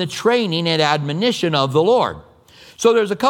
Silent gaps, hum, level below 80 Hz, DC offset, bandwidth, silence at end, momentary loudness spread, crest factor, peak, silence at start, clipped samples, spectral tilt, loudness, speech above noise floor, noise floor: none; none; -56 dBFS; under 0.1%; 16 kHz; 0 s; 4 LU; 16 dB; 0 dBFS; 0 s; under 0.1%; -5 dB/octave; -17 LUFS; 29 dB; -46 dBFS